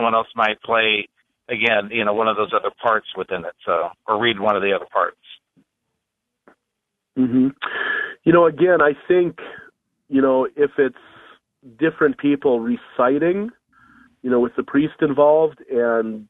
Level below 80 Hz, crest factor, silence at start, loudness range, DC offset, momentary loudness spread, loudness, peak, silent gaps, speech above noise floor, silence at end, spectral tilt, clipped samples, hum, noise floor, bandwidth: -60 dBFS; 18 dB; 0 s; 5 LU; under 0.1%; 10 LU; -19 LUFS; -2 dBFS; none; 61 dB; 0.05 s; -8 dB/octave; under 0.1%; none; -79 dBFS; 4 kHz